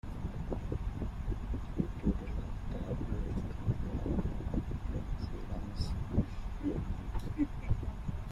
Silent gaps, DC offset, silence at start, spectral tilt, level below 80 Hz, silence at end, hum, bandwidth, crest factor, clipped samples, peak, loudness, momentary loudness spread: none; under 0.1%; 0.05 s; -8.5 dB/octave; -40 dBFS; 0 s; none; 11.5 kHz; 18 dB; under 0.1%; -18 dBFS; -38 LUFS; 6 LU